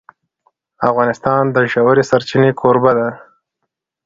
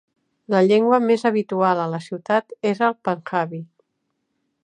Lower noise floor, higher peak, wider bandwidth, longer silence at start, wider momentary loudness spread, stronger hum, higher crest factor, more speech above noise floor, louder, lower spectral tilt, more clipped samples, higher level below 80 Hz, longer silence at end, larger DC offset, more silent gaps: about the same, -75 dBFS vs -74 dBFS; first, 0 dBFS vs -4 dBFS; second, 7.6 kHz vs 10 kHz; first, 0.8 s vs 0.5 s; second, 5 LU vs 10 LU; neither; about the same, 16 dB vs 18 dB; first, 62 dB vs 55 dB; first, -14 LUFS vs -20 LUFS; about the same, -7 dB/octave vs -7 dB/octave; neither; first, -54 dBFS vs -74 dBFS; second, 0.85 s vs 1 s; neither; neither